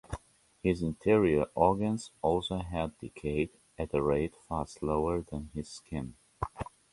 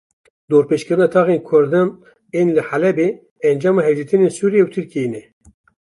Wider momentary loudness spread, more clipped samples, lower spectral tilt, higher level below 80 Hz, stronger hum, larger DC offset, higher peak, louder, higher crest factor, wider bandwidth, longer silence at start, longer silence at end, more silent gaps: first, 14 LU vs 8 LU; neither; about the same, -7 dB/octave vs -7.5 dB/octave; first, -48 dBFS vs -62 dBFS; neither; neither; second, -10 dBFS vs -2 dBFS; second, -32 LUFS vs -17 LUFS; first, 22 dB vs 14 dB; about the same, 11.5 kHz vs 11.5 kHz; second, 0.1 s vs 0.5 s; second, 0.3 s vs 0.65 s; second, none vs 3.31-3.36 s